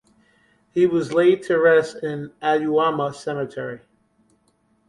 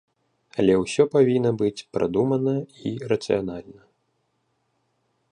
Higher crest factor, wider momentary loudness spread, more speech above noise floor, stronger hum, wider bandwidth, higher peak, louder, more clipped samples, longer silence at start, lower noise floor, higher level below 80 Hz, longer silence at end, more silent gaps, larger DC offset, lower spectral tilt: about the same, 16 dB vs 18 dB; about the same, 13 LU vs 13 LU; second, 44 dB vs 50 dB; neither; about the same, 11.5 kHz vs 10.5 kHz; about the same, -4 dBFS vs -6 dBFS; about the same, -21 LUFS vs -23 LUFS; neither; first, 0.75 s vs 0.55 s; second, -64 dBFS vs -72 dBFS; second, -64 dBFS vs -56 dBFS; second, 1.1 s vs 1.6 s; neither; neither; about the same, -6.5 dB/octave vs -6.5 dB/octave